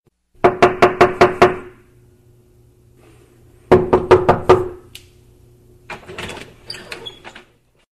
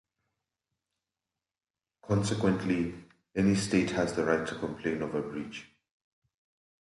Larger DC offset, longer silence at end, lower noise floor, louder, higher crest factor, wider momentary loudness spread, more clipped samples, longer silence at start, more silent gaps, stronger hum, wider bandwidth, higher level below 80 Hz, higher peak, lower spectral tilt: neither; second, 0.65 s vs 1.2 s; second, -53 dBFS vs under -90 dBFS; first, -14 LUFS vs -30 LUFS; about the same, 18 dB vs 22 dB; first, 21 LU vs 11 LU; neither; second, 0.45 s vs 2.05 s; neither; neither; about the same, 12.5 kHz vs 11.5 kHz; first, -40 dBFS vs -58 dBFS; first, 0 dBFS vs -12 dBFS; about the same, -6 dB/octave vs -6 dB/octave